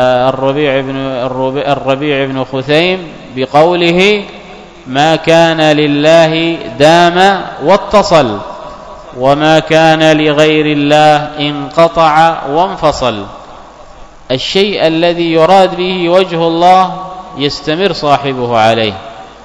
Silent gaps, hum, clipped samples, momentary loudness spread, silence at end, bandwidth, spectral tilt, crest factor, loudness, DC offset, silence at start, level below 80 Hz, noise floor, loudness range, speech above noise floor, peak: none; none; 2%; 11 LU; 0 s; 11 kHz; -5.5 dB/octave; 10 dB; -9 LUFS; under 0.1%; 0 s; -40 dBFS; -33 dBFS; 4 LU; 23 dB; 0 dBFS